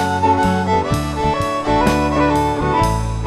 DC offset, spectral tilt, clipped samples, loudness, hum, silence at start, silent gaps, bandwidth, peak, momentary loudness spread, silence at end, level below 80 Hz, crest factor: under 0.1%; -6 dB/octave; under 0.1%; -17 LUFS; none; 0 s; none; 13.5 kHz; -2 dBFS; 4 LU; 0 s; -28 dBFS; 16 dB